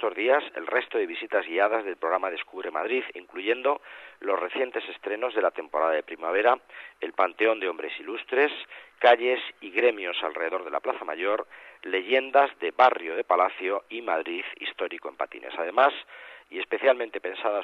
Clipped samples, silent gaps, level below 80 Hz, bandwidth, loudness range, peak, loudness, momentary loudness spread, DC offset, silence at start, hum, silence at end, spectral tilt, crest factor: under 0.1%; none; -78 dBFS; 6.2 kHz; 4 LU; -6 dBFS; -26 LUFS; 12 LU; under 0.1%; 0 s; none; 0 s; -4 dB/octave; 20 dB